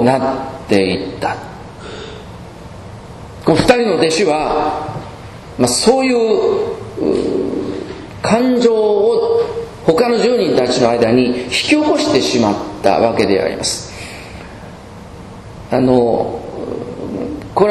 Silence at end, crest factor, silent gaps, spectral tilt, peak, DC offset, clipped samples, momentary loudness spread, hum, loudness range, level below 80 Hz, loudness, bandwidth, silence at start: 0 s; 16 dB; none; -4.5 dB/octave; 0 dBFS; under 0.1%; under 0.1%; 21 LU; none; 6 LU; -42 dBFS; -15 LUFS; 12.5 kHz; 0 s